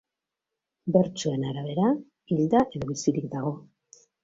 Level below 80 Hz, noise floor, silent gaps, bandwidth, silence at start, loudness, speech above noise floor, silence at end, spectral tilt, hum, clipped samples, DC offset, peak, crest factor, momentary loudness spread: -60 dBFS; -87 dBFS; none; 8 kHz; 0.85 s; -27 LUFS; 61 dB; 0.65 s; -6.5 dB/octave; none; under 0.1%; under 0.1%; -6 dBFS; 20 dB; 9 LU